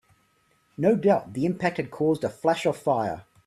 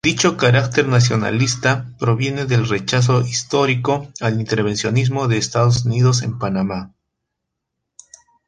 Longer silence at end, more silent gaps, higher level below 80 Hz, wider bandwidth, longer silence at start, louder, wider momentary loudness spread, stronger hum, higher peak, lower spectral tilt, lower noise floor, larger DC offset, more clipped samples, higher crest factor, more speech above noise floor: second, 0.25 s vs 1.6 s; neither; second, -64 dBFS vs -48 dBFS; first, 14 kHz vs 9.8 kHz; first, 0.8 s vs 0.05 s; second, -25 LUFS vs -17 LUFS; about the same, 6 LU vs 6 LU; neither; second, -6 dBFS vs -2 dBFS; first, -7 dB/octave vs -5 dB/octave; second, -66 dBFS vs -78 dBFS; neither; neither; about the same, 18 dB vs 16 dB; second, 42 dB vs 61 dB